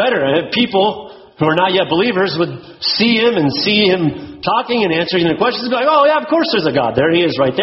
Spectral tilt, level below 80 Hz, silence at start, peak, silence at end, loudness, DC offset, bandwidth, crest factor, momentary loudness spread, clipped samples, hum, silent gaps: -3 dB/octave; -52 dBFS; 0 s; 0 dBFS; 0 s; -14 LUFS; under 0.1%; 6 kHz; 14 dB; 6 LU; under 0.1%; none; none